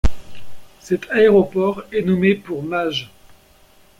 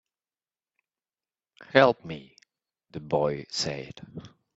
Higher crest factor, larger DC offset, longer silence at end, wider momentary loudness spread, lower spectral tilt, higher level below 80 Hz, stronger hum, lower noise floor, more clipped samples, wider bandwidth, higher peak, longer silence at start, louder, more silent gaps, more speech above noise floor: second, 16 dB vs 30 dB; neither; first, 0.95 s vs 0.3 s; second, 11 LU vs 23 LU; first, -6.5 dB/octave vs -3 dB/octave; first, -32 dBFS vs -64 dBFS; neither; second, -51 dBFS vs under -90 dBFS; neither; first, 14.5 kHz vs 8 kHz; about the same, -2 dBFS vs 0 dBFS; second, 0.05 s vs 1.6 s; first, -18 LUFS vs -25 LUFS; neither; second, 34 dB vs over 63 dB